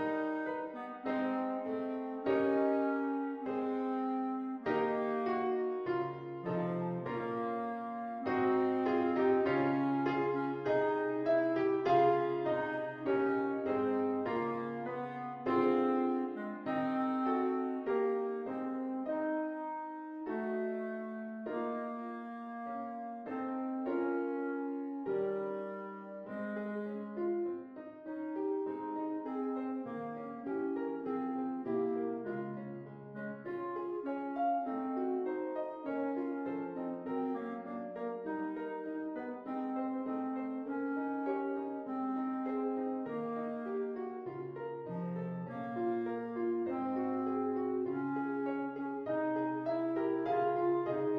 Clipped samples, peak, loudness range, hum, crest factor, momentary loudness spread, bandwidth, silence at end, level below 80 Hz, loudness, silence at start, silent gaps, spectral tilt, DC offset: under 0.1%; -16 dBFS; 7 LU; none; 18 dB; 10 LU; 5.6 kHz; 0 s; -78 dBFS; -36 LUFS; 0 s; none; -9 dB/octave; under 0.1%